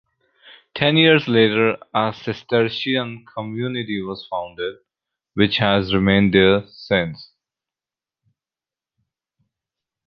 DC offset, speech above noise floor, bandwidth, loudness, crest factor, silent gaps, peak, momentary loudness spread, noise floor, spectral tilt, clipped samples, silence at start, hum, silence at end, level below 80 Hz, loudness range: under 0.1%; over 71 dB; 6.4 kHz; -19 LUFS; 20 dB; none; -2 dBFS; 15 LU; under -90 dBFS; -8 dB/octave; under 0.1%; 0.45 s; none; 2.85 s; -48 dBFS; 6 LU